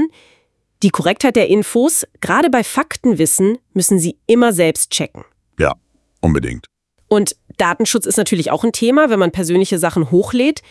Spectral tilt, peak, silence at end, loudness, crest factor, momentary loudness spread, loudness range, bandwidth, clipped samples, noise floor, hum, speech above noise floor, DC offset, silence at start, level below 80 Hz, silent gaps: -4.5 dB/octave; 0 dBFS; 0.1 s; -15 LUFS; 16 dB; 7 LU; 4 LU; 12 kHz; under 0.1%; -59 dBFS; none; 44 dB; under 0.1%; 0 s; -42 dBFS; none